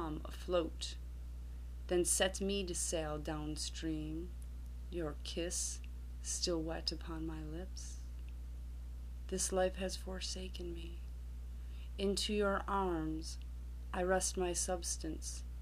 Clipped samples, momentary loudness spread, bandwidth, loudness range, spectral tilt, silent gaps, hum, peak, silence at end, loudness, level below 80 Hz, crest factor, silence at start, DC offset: under 0.1%; 14 LU; 15.5 kHz; 4 LU; -3.5 dB/octave; none; 60 Hz at -45 dBFS; -20 dBFS; 0 s; -40 LUFS; -46 dBFS; 20 dB; 0 s; under 0.1%